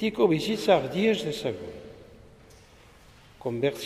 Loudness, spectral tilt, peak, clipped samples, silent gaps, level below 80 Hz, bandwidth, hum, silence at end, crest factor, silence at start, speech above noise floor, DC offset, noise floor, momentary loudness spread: -26 LUFS; -5.5 dB/octave; -8 dBFS; under 0.1%; none; -58 dBFS; 15.5 kHz; none; 0 s; 20 dB; 0 s; 28 dB; under 0.1%; -53 dBFS; 18 LU